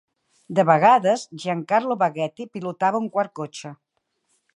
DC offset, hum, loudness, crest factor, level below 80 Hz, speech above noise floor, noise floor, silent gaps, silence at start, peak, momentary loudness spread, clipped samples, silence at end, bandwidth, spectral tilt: under 0.1%; none; -21 LUFS; 20 dB; -76 dBFS; 51 dB; -72 dBFS; none; 0.5 s; -2 dBFS; 17 LU; under 0.1%; 0.85 s; 11 kHz; -5.5 dB/octave